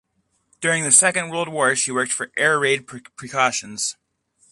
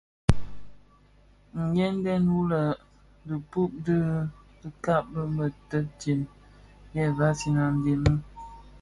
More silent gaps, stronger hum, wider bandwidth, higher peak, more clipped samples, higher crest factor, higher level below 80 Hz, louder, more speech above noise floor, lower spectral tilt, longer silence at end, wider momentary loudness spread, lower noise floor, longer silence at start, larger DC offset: neither; second, none vs 50 Hz at -50 dBFS; about the same, 12 kHz vs 11.5 kHz; about the same, 0 dBFS vs -2 dBFS; neither; about the same, 22 dB vs 24 dB; second, -66 dBFS vs -44 dBFS; first, -19 LUFS vs -28 LUFS; first, 47 dB vs 31 dB; second, -1.5 dB/octave vs -7.5 dB/octave; first, 0.6 s vs 0.05 s; about the same, 13 LU vs 14 LU; first, -68 dBFS vs -57 dBFS; first, 0.6 s vs 0.3 s; neither